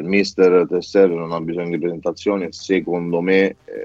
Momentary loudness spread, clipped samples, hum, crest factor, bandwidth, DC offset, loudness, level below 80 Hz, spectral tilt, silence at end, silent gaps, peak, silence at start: 9 LU; under 0.1%; none; 16 dB; 7.8 kHz; under 0.1%; -18 LUFS; -58 dBFS; -6 dB/octave; 0 s; none; -2 dBFS; 0 s